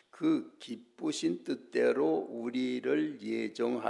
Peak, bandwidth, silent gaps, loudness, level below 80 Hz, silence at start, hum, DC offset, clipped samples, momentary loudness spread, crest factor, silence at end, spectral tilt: -16 dBFS; 11 kHz; none; -33 LUFS; under -90 dBFS; 0.15 s; none; under 0.1%; under 0.1%; 9 LU; 16 dB; 0 s; -5 dB/octave